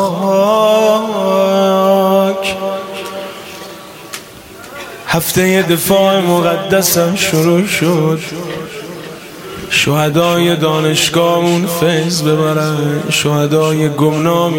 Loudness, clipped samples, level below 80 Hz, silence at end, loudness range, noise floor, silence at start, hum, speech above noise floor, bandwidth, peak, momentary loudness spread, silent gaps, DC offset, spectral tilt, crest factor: -12 LUFS; under 0.1%; -50 dBFS; 0 s; 5 LU; -33 dBFS; 0 s; none; 21 dB; 17 kHz; 0 dBFS; 17 LU; none; under 0.1%; -4.5 dB/octave; 14 dB